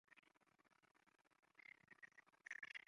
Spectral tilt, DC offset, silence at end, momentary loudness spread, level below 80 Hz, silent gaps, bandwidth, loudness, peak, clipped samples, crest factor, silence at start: -1 dB/octave; under 0.1%; 0.1 s; 11 LU; under -90 dBFS; none; 11 kHz; -60 LUFS; -40 dBFS; under 0.1%; 24 dB; 0.1 s